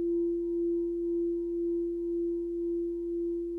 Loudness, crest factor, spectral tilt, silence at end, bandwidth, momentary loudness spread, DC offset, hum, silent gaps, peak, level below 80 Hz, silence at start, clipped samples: -32 LUFS; 6 dB; -10.5 dB/octave; 0 s; 1 kHz; 3 LU; under 0.1%; none; none; -24 dBFS; -56 dBFS; 0 s; under 0.1%